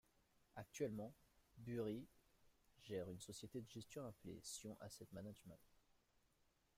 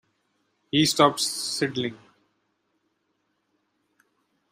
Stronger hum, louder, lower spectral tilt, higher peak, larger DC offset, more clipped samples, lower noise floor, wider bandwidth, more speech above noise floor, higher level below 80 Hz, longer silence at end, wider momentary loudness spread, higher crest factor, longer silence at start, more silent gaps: neither; second, -53 LUFS vs -23 LUFS; first, -5 dB/octave vs -3.5 dB/octave; second, -34 dBFS vs -4 dBFS; neither; neither; first, -82 dBFS vs -74 dBFS; about the same, 16 kHz vs 15.5 kHz; second, 29 dB vs 51 dB; second, -78 dBFS vs -66 dBFS; second, 1.05 s vs 2.55 s; first, 14 LU vs 10 LU; about the same, 22 dB vs 24 dB; second, 0.55 s vs 0.75 s; neither